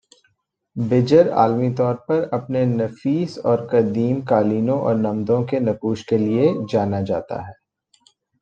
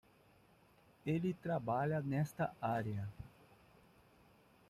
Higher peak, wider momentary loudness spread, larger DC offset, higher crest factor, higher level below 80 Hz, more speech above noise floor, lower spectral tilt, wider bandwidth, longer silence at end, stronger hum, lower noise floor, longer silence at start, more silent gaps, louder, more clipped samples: first, -2 dBFS vs -26 dBFS; second, 9 LU vs 12 LU; neither; about the same, 18 dB vs 16 dB; first, -60 dBFS vs -70 dBFS; first, 49 dB vs 30 dB; about the same, -8.5 dB/octave vs -8 dB/octave; second, 8 kHz vs 14.5 kHz; second, 0.9 s vs 1.4 s; neither; about the same, -68 dBFS vs -68 dBFS; second, 0.75 s vs 1.05 s; neither; first, -20 LUFS vs -40 LUFS; neither